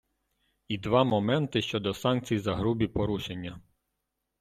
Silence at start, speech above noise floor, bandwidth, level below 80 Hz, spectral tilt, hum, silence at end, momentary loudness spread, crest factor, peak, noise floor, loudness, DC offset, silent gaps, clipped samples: 0.7 s; 54 dB; 14.5 kHz; -54 dBFS; -6.5 dB/octave; none; 0.8 s; 12 LU; 20 dB; -10 dBFS; -82 dBFS; -28 LUFS; under 0.1%; none; under 0.1%